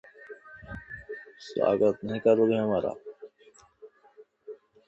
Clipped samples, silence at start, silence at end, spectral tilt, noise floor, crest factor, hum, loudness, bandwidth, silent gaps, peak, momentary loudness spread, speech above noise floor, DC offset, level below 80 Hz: under 0.1%; 0.2 s; 0.35 s; -7.5 dB/octave; -59 dBFS; 20 dB; none; -26 LUFS; 8.2 kHz; none; -10 dBFS; 24 LU; 34 dB; under 0.1%; -60 dBFS